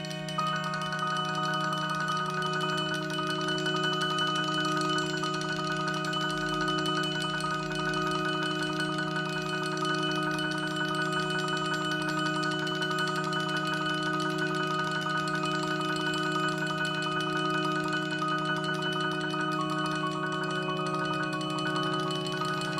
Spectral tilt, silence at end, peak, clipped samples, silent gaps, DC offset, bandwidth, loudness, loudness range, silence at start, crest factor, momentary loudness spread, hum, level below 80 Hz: -4 dB/octave; 0 s; -16 dBFS; under 0.1%; none; under 0.1%; 15 kHz; -29 LUFS; 1 LU; 0 s; 14 dB; 3 LU; none; -62 dBFS